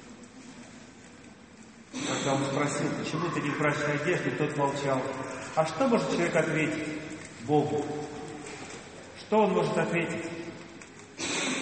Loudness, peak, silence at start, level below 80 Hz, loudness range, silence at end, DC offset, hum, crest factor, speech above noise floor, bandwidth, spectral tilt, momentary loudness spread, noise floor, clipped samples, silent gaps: -29 LUFS; -10 dBFS; 0 s; -64 dBFS; 3 LU; 0 s; under 0.1%; none; 20 dB; 23 dB; 8.8 kHz; -5 dB/octave; 21 LU; -51 dBFS; under 0.1%; none